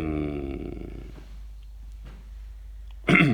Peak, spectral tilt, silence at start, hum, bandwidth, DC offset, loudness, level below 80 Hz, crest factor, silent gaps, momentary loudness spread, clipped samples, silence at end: -6 dBFS; -7 dB/octave; 0 s; none; 20 kHz; under 0.1%; -27 LUFS; -40 dBFS; 22 dB; none; 20 LU; under 0.1%; 0 s